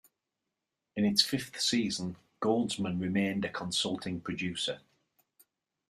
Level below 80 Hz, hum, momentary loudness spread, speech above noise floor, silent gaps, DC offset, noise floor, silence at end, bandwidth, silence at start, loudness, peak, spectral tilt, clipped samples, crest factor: -68 dBFS; none; 10 LU; 55 dB; none; under 0.1%; -87 dBFS; 1.1 s; 15 kHz; 0.95 s; -31 LUFS; -10 dBFS; -4 dB/octave; under 0.1%; 24 dB